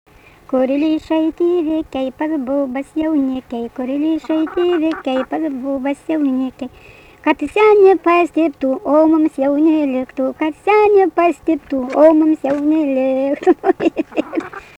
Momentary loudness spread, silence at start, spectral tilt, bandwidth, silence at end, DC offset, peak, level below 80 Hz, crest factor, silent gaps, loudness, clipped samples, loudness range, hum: 10 LU; 0.5 s; -6 dB/octave; 9.2 kHz; 0.15 s; under 0.1%; 0 dBFS; -52 dBFS; 16 dB; none; -16 LUFS; under 0.1%; 5 LU; none